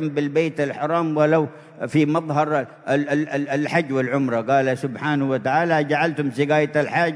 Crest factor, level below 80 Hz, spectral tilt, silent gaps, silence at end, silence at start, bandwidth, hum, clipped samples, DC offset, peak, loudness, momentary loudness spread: 16 dB; -70 dBFS; -7 dB/octave; none; 0 s; 0 s; 11 kHz; none; under 0.1%; under 0.1%; -4 dBFS; -21 LUFS; 5 LU